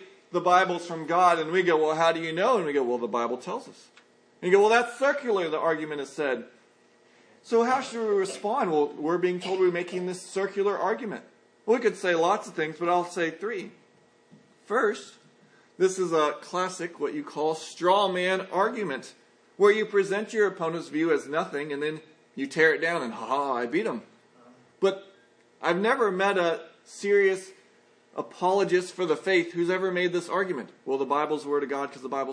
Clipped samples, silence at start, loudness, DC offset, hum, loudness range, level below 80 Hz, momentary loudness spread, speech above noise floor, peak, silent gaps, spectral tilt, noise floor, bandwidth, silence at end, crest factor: under 0.1%; 0 s; -26 LUFS; under 0.1%; none; 3 LU; -86 dBFS; 11 LU; 35 dB; -6 dBFS; none; -4.5 dB/octave; -60 dBFS; 10.5 kHz; 0 s; 20 dB